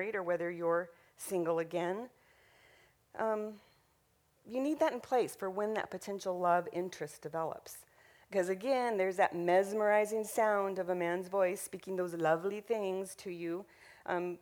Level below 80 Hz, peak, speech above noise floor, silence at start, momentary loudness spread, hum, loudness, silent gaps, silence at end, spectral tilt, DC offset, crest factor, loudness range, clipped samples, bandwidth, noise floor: -78 dBFS; -16 dBFS; 39 dB; 0 s; 12 LU; none; -35 LUFS; none; 0.05 s; -5 dB/octave; under 0.1%; 20 dB; 7 LU; under 0.1%; over 20 kHz; -73 dBFS